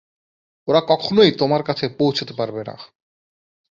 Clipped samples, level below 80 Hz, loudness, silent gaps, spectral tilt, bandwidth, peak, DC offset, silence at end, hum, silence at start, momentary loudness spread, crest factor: under 0.1%; -60 dBFS; -18 LUFS; none; -6.5 dB/octave; 7.4 kHz; -2 dBFS; under 0.1%; 0.9 s; none; 0.65 s; 15 LU; 20 dB